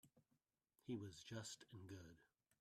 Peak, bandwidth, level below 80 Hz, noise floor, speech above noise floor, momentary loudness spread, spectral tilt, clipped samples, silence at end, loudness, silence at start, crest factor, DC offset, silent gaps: -38 dBFS; 14.5 kHz; -84 dBFS; -89 dBFS; 34 dB; 10 LU; -4.5 dB/octave; under 0.1%; 0.35 s; -56 LUFS; 0.05 s; 20 dB; under 0.1%; none